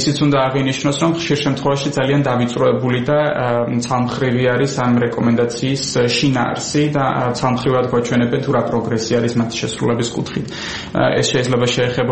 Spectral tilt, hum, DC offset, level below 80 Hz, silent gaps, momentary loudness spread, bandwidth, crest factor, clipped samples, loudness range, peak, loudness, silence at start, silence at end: -5.5 dB/octave; none; 0.3%; -46 dBFS; none; 4 LU; 8.8 kHz; 16 dB; under 0.1%; 2 LU; -2 dBFS; -17 LUFS; 0 s; 0 s